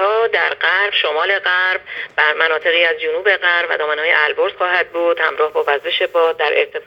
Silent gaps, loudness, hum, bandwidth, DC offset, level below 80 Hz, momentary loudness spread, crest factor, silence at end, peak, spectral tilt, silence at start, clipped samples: none; -15 LUFS; none; 7.2 kHz; under 0.1%; -64 dBFS; 4 LU; 16 dB; 0.05 s; 0 dBFS; -2.5 dB/octave; 0 s; under 0.1%